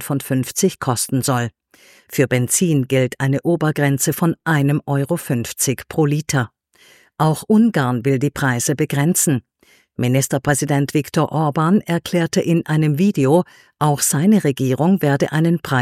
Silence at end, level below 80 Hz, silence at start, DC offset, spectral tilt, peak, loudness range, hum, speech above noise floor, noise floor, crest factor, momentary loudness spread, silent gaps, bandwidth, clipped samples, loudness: 0 s; -54 dBFS; 0 s; under 0.1%; -5.5 dB/octave; -2 dBFS; 2 LU; none; 34 dB; -51 dBFS; 16 dB; 5 LU; none; 16.5 kHz; under 0.1%; -18 LUFS